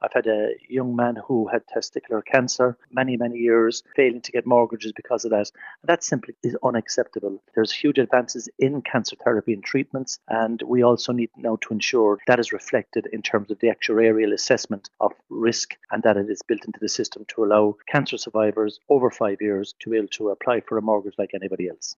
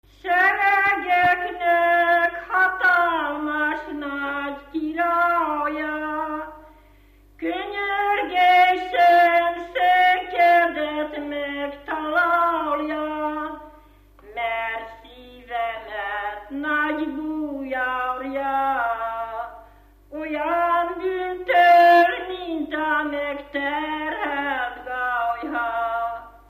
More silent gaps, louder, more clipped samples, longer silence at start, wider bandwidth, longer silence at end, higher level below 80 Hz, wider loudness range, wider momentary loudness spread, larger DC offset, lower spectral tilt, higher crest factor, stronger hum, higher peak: neither; about the same, -23 LUFS vs -21 LUFS; neither; second, 0 s vs 0.25 s; second, 7.6 kHz vs 15 kHz; about the same, 0.05 s vs 0.15 s; second, -72 dBFS vs -54 dBFS; second, 2 LU vs 9 LU; second, 9 LU vs 13 LU; neither; about the same, -4 dB/octave vs -4.5 dB/octave; about the same, 20 dB vs 18 dB; neither; about the same, -2 dBFS vs -4 dBFS